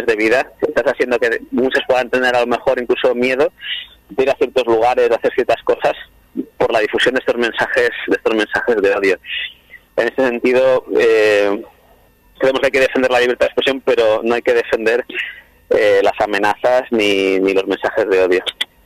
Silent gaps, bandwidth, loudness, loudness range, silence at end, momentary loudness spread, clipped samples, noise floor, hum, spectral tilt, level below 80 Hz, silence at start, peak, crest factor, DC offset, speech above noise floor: none; 14 kHz; -15 LUFS; 2 LU; 0.2 s; 7 LU; under 0.1%; -50 dBFS; none; -4 dB/octave; -50 dBFS; 0 s; -2 dBFS; 14 dB; under 0.1%; 35 dB